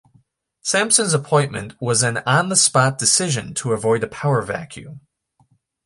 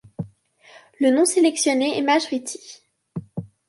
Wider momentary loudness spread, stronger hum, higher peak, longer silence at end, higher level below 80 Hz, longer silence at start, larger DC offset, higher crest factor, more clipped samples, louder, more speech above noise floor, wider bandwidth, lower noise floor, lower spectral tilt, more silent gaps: second, 13 LU vs 19 LU; neither; first, 0 dBFS vs -6 dBFS; first, 0.85 s vs 0.25 s; first, -56 dBFS vs -64 dBFS; first, 0.65 s vs 0.2 s; neither; about the same, 20 dB vs 16 dB; neither; about the same, -18 LUFS vs -20 LUFS; first, 42 dB vs 32 dB; about the same, 11.5 kHz vs 11.5 kHz; first, -61 dBFS vs -52 dBFS; about the same, -3 dB/octave vs -3.5 dB/octave; neither